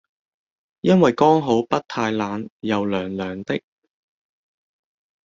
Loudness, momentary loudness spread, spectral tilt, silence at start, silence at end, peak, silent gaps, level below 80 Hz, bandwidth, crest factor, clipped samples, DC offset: -21 LUFS; 12 LU; -7 dB/octave; 0.85 s; 1.65 s; -2 dBFS; 2.50-2.60 s; -60 dBFS; 7.6 kHz; 20 dB; under 0.1%; under 0.1%